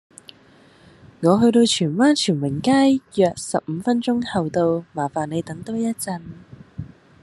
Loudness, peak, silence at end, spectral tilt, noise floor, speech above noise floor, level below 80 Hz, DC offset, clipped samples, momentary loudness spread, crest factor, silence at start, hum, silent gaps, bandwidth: -20 LUFS; -2 dBFS; 0.35 s; -5 dB/octave; -51 dBFS; 32 dB; -58 dBFS; under 0.1%; under 0.1%; 17 LU; 18 dB; 1.2 s; none; none; 12.5 kHz